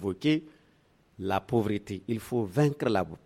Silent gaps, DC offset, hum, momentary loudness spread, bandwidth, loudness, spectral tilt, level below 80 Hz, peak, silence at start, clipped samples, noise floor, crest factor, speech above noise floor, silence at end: none; under 0.1%; none; 8 LU; 15.5 kHz; -29 LUFS; -7 dB/octave; -60 dBFS; -12 dBFS; 0 s; under 0.1%; -64 dBFS; 16 dB; 36 dB; 0.1 s